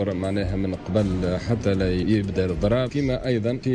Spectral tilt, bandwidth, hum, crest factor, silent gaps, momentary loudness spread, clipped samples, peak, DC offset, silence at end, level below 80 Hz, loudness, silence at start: -7.5 dB/octave; 10 kHz; none; 12 dB; none; 3 LU; under 0.1%; -10 dBFS; under 0.1%; 0 s; -38 dBFS; -24 LUFS; 0 s